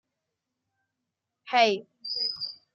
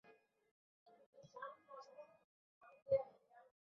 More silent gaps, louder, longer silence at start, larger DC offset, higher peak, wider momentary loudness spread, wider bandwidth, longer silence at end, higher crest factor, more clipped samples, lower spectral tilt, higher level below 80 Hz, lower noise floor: second, none vs 0.51-0.86 s, 1.06-1.13 s, 2.24-2.61 s, 2.82-2.86 s; first, -27 LUFS vs -45 LUFS; first, 1.45 s vs 0.05 s; neither; first, -8 dBFS vs -26 dBFS; second, 11 LU vs 25 LU; first, 7.2 kHz vs 6.4 kHz; about the same, 0.2 s vs 0.2 s; about the same, 22 dB vs 24 dB; neither; second, -2.5 dB/octave vs -4.5 dB/octave; about the same, -84 dBFS vs -84 dBFS; first, -84 dBFS vs -62 dBFS